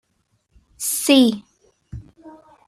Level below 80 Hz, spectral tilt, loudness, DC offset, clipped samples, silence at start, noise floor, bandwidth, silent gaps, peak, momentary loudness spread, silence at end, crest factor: -52 dBFS; -3 dB/octave; -17 LUFS; under 0.1%; under 0.1%; 0.8 s; -68 dBFS; 14.5 kHz; none; -2 dBFS; 25 LU; 0.4 s; 20 dB